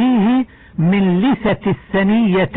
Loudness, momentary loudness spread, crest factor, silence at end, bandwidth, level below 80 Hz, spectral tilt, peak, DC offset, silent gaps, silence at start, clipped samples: -16 LUFS; 5 LU; 8 dB; 0 s; 4 kHz; -44 dBFS; -11 dB/octave; -6 dBFS; under 0.1%; none; 0 s; under 0.1%